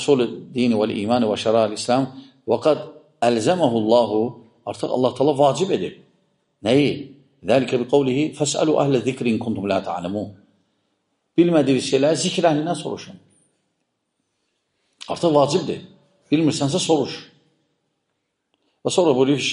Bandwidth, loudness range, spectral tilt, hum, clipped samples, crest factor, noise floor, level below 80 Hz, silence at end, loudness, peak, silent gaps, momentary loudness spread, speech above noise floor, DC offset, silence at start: 10.5 kHz; 5 LU; -5 dB/octave; none; under 0.1%; 18 dB; -75 dBFS; -64 dBFS; 0 s; -20 LUFS; -4 dBFS; none; 14 LU; 56 dB; under 0.1%; 0 s